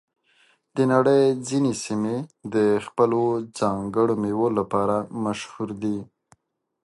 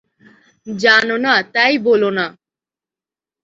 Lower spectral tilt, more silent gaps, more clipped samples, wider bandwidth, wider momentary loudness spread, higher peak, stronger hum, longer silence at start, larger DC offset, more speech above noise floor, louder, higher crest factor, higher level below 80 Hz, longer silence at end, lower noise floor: first, -6.5 dB/octave vs -4 dB/octave; neither; neither; first, 11.5 kHz vs 7.8 kHz; about the same, 10 LU vs 11 LU; second, -4 dBFS vs 0 dBFS; neither; about the same, 0.75 s vs 0.65 s; neither; second, 46 dB vs 75 dB; second, -23 LUFS vs -14 LUFS; about the same, 18 dB vs 18 dB; about the same, -60 dBFS vs -62 dBFS; second, 0.8 s vs 1.15 s; second, -68 dBFS vs -90 dBFS